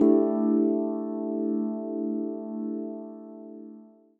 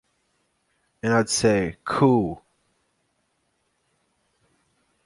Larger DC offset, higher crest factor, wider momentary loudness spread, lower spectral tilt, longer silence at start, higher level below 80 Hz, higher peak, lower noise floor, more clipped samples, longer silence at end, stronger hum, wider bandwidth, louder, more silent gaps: neither; about the same, 18 dB vs 22 dB; first, 20 LU vs 11 LU; first, -12 dB/octave vs -5 dB/octave; second, 0 s vs 1.05 s; second, -76 dBFS vs -54 dBFS; about the same, -8 dBFS vs -6 dBFS; second, -50 dBFS vs -72 dBFS; neither; second, 0.3 s vs 2.7 s; neither; second, 2.2 kHz vs 11.5 kHz; second, -28 LUFS vs -22 LUFS; neither